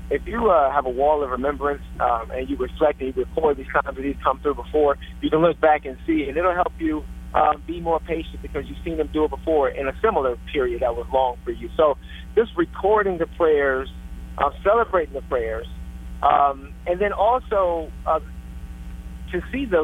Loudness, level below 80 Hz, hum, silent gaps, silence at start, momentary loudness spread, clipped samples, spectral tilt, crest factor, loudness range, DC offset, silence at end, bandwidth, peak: -22 LUFS; -36 dBFS; none; none; 0 s; 12 LU; under 0.1%; -7.5 dB/octave; 18 dB; 2 LU; under 0.1%; 0 s; 13.5 kHz; -4 dBFS